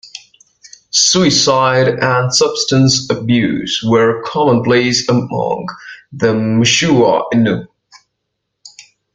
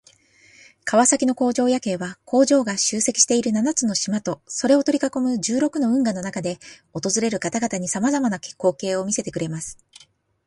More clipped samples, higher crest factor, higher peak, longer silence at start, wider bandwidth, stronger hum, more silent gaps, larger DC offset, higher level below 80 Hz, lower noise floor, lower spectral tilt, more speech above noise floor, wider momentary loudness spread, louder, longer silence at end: neither; second, 14 dB vs 20 dB; about the same, 0 dBFS vs 0 dBFS; second, 0.05 s vs 0.85 s; second, 9.6 kHz vs 11.5 kHz; neither; neither; neither; first, -50 dBFS vs -62 dBFS; first, -73 dBFS vs -54 dBFS; about the same, -4 dB/octave vs -3.5 dB/octave; first, 60 dB vs 33 dB; about the same, 9 LU vs 11 LU; first, -13 LUFS vs -21 LUFS; second, 0.35 s vs 0.75 s